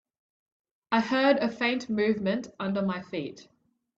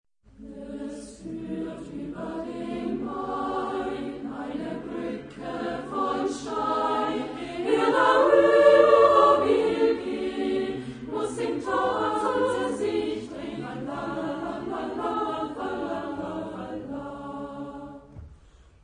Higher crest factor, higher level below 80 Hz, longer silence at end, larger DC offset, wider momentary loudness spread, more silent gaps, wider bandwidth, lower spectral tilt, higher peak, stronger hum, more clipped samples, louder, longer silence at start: about the same, 18 dB vs 22 dB; second, -68 dBFS vs -56 dBFS; about the same, 0.55 s vs 0.5 s; neither; second, 11 LU vs 18 LU; neither; second, 7.8 kHz vs 10.5 kHz; about the same, -6 dB/octave vs -5.5 dB/octave; second, -10 dBFS vs -4 dBFS; neither; neither; about the same, -27 LUFS vs -25 LUFS; first, 0.9 s vs 0.4 s